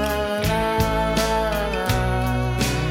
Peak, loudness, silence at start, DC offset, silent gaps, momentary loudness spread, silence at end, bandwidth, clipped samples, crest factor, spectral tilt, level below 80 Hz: -6 dBFS; -22 LUFS; 0 s; under 0.1%; none; 2 LU; 0 s; 17 kHz; under 0.1%; 14 dB; -5 dB/octave; -30 dBFS